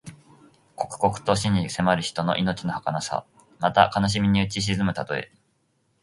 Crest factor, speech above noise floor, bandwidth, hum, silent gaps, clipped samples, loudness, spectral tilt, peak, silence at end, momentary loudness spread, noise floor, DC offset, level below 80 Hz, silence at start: 24 dB; 45 dB; 11.5 kHz; none; none; under 0.1%; -24 LUFS; -5 dB/octave; -2 dBFS; 0.75 s; 11 LU; -69 dBFS; under 0.1%; -48 dBFS; 0.05 s